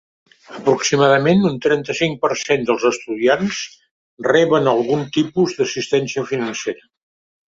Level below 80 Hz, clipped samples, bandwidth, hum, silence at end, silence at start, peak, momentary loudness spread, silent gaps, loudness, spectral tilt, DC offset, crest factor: -58 dBFS; under 0.1%; 7.8 kHz; none; 0.7 s; 0.5 s; -2 dBFS; 10 LU; 3.91-4.17 s; -18 LUFS; -4.5 dB/octave; under 0.1%; 16 dB